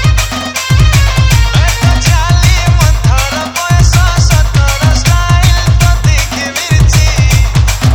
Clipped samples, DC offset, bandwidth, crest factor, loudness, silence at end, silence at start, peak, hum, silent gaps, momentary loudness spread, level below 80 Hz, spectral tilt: 0.8%; under 0.1%; 19.5 kHz; 8 dB; -9 LUFS; 0 s; 0 s; 0 dBFS; none; none; 4 LU; -12 dBFS; -4.5 dB/octave